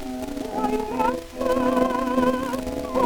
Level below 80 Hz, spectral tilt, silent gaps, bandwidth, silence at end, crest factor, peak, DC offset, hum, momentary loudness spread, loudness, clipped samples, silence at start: -42 dBFS; -5.5 dB/octave; none; over 20 kHz; 0 s; 16 dB; -8 dBFS; under 0.1%; none; 7 LU; -24 LUFS; under 0.1%; 0 s